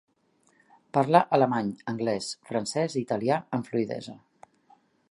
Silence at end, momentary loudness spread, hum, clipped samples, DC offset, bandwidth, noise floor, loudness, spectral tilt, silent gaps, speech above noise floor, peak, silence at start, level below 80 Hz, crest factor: 0.95 s; 11 LU; none; under 0.1%; under 0.1%; 11.5 kHz; -67 dBFS; -27 LUFS; -5.5 dB/octave; none; 41 dB; -4 dBFS; 0.95 s; -70 dBFS; 24 dB